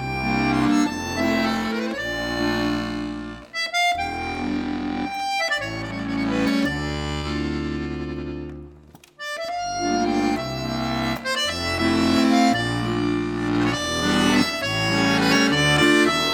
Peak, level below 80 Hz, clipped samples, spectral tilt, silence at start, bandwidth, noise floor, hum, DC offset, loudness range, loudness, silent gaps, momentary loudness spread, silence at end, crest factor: -6 dBFS; -42 dBFS; under 0.1%; -4.5 dB/octave; 0 s; 19 kHz; -48 dBFS; none; under 0.1%; 6 LU; -22 LUFS; none; 11 LU; 0 s; 18 dB